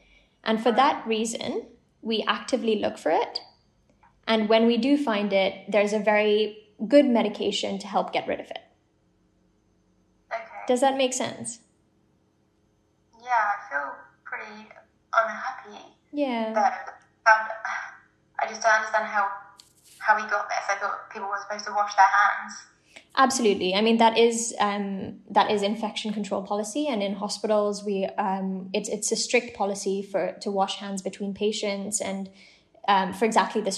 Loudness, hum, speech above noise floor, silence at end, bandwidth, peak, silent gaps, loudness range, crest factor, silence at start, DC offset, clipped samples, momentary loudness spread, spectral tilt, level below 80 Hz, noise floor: -25 LUFS; none; 42 dB; 0 s; 12.5 kHz; -4 dBFS; none; 7 LU; 22 dB; 0.45 s; under 0.1%; under 0.1%; 16 LU; -3.5 dB/octave; -72 dBFS; -66 dBFS